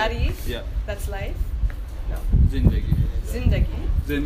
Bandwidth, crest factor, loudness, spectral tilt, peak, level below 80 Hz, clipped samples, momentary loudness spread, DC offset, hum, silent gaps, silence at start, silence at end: 15.5 kHz; 18 dB; -25 LUFS; -7 dB/octave; -4 dBFS; -24 dBFS; under 0.1%; 9 LU; under 0.1%; none; none; 0 s; 0 s